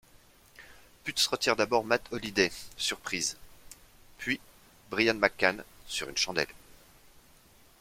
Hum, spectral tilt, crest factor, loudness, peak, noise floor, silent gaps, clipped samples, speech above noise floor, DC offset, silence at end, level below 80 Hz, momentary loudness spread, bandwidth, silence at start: none; -2 dB/octave; 28 dB; -30 LUFS; -6 dBFS; -59 dBFS; none; under 0.1%; 29 dB; under 0.1%; 1.1 s; -60 dBFS; 11 LU; 16.5 kHz; 0.6 s